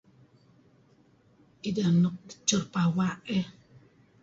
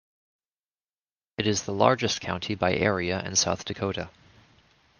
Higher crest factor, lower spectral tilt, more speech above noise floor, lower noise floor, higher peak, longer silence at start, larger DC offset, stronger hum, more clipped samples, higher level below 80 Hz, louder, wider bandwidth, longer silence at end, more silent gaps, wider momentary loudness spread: about the same, 20 dB vs 24 dB; first, -5 dB/octave vs -3.5 dB/octave; second, 35 dB vs over 64 dB; second, -62 dBFS vs under -90 dBFS; second, -12 dBFS vs -4 dBFS; first, 1.65 s vs 1.4 s; neither; neither; neither; about the same, -64 dBFS vs -60 dBFS; about the same, -28 LUFS vs -26 LUFS; second, 7.8 kHz vs 11 kHz; second, 0.7 s vs 0.9 s; neither; about the same, 9 LU vs 9 LU